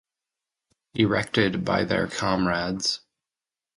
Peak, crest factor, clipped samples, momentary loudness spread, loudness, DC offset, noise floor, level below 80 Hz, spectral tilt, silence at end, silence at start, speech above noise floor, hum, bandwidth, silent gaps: -4 dBFS; 22 dB; under 0.1%; 4 LU; -24 LUFS; under 0.1%; under -90 dBFS; -52 dBFS; -4.5 dB/octave; 0.8 s; 0.95 s; over 66 dB; none; 11.5 kHz; none